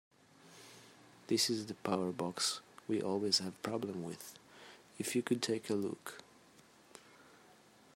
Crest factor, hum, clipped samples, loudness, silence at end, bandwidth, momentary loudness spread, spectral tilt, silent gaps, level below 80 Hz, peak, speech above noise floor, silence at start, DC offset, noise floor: 22 dB; none; under 0.1%; -37 LUFS; 0.65 s; 16 kHz; 24 LU; -3.5 dB/octave; none; -84 dBFS; -18 dBFS; 26 dB; 0.45 s; under 0.1%; -63 dBFS